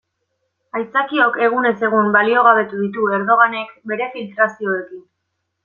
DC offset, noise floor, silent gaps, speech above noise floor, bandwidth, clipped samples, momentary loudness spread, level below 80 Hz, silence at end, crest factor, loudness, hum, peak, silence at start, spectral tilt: under 0.1%; -74 dBFS; none; 57 dB; 7 kHz; under 0.1%; 13 LU; -70 dBFS; 0.65 s; 16 dB; -16 LUFS; none; -2 dBFS; 0.75 s; -7 dB/octave